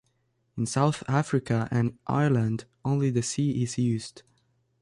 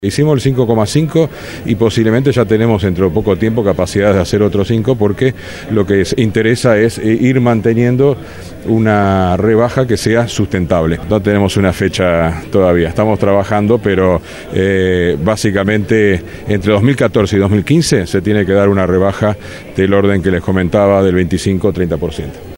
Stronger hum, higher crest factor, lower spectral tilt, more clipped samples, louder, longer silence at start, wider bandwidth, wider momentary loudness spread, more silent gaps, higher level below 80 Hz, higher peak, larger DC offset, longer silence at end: neither; about the same, 16 dB vs 12 dB; about the same, -6.5 dB/octave vs -6.5 dB/octave; neither; second, -27 LUFS vs -12 LUFS; first, 0.55 s vs 0 s; second, 11.5 kHz vs 16.5 kHz; first, 8 LU vs 5 LU; neither; second, -58 dBFS vs -34 dBFS; second, -10 dBFS vs 0 dBFS; neither; first, 0.6 s vs 0 s